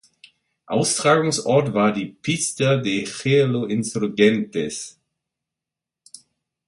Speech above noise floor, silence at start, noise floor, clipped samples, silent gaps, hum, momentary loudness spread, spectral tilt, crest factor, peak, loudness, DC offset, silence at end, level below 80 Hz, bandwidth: 67 dB; 0.7 s; -87 dBFS; under 0.1%; none; none; 9 LU; -4.5 dB/octave; 20 dB; -2 dBFS; -20 LUFS; under 0.1%; 1.75 s; -62 dBFS; 11.5 kHz